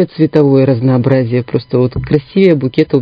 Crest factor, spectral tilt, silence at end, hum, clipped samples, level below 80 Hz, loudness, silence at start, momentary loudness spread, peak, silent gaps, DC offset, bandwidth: 10 dB; -10.5 dB/octave; 0 s; none; 0.3%; -38 dBFS; -12 LUFS; 0 s; 6 LU; 0 dBFS; none; under 0.1%; 5.2 kHz